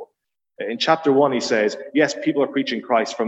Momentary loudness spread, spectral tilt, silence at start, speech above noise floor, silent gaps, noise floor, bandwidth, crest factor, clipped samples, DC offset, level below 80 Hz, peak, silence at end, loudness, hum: 6 LU; -4 dB/octave; 0 s; 56 dB; none; -75 dBFS; 8.2 kHz; 18 dB; under 0.1%; under 0.1%; -70 dBFS; -2 dBFS; 0 s; -20 LUFS; none